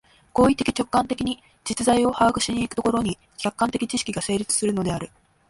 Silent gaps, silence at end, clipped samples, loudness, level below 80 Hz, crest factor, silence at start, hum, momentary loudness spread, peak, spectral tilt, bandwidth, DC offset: none; 0.4 s; under 0.1%; -23 LUFS; -48 dBFS; 18 dB; 0.35 s; none; 9 LU; -6 dBFS; -4 dB/octave; 11.5 kHz; under 0.1%